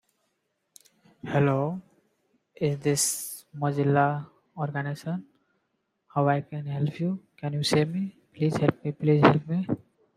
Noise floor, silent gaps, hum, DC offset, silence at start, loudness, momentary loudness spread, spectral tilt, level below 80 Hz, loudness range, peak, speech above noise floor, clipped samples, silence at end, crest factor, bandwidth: -77 dBFS; none; none; under 0.1%; 1.25 s; -27 LUFS; 12 LU; -5.5 dB/octave; -66 dBFS; 5 LU; -2 dBFS; 51 dB; under 0.1%; 0.4 s; 24 dB; 16 kHz